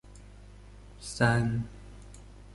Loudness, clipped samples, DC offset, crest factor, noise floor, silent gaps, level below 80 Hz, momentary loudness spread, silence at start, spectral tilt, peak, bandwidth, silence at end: -29 LUFS; under 0.1%; under 0.1%; 24 dB; -50 dBFS; none; -48 dBFS; 27 LU; 0.05 s; -6 dB/octave; -10 dBFS; 11.5 kHz; 0 s